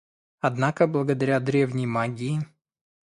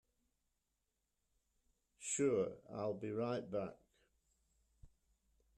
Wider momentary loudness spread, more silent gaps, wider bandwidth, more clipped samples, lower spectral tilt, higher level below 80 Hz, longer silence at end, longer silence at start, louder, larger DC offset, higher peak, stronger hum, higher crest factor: about the same, 7 LU vs 9 LU; neither; about the same, 11.5 kHz vs 11.5 kHz; neither; first, -7.5 dB/octave vs -5 dB/octave; first, -64 dBFS vs -76 dBFS; about the same, 0.6 s vs 0.7 s; second, 0.45 s vs 2 s; first, -25 LUFS vs -41 LUFS; neither; first, -6 dBFS vs -26 dBFS; neither; about the same, 20 dB vs 20 dB